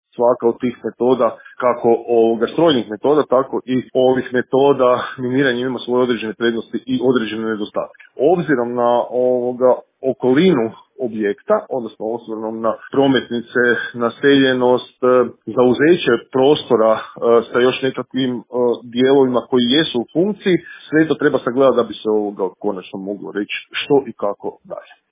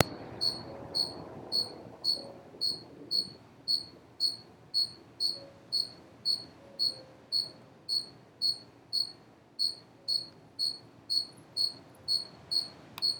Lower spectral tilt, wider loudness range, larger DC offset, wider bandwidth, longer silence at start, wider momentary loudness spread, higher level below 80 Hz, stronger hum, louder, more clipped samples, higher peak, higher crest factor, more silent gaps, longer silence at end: first, -10 dB/octave vs -2 dB/octave; first, 4 LU vs 1 LU; neither; second, 3.9 kHz vs 20 kHz; first, 0.2 s vs 0 s; about the same, 10 LU vs 11 LU; first, -58 dBFS vs -72 dBFS; neither; first, -17 LUFS vs -32 LUFS; neither; about the same, 0 dBFS vs -2 dBFS; second, 16 dB vs 34 dB; neither; first, 0.3 s vs 0 s